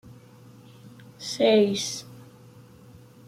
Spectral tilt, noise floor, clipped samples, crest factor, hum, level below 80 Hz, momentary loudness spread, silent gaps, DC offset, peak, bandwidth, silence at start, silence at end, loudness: -4 dB/octave; -50 dBFS; under 0.1%; 20 dB; none; -68 dBFS; 18 LU; none; under 0.1%; -8 dBFS; 15.5 kHz; 0.1 s; 1.05 s; -24 LUFS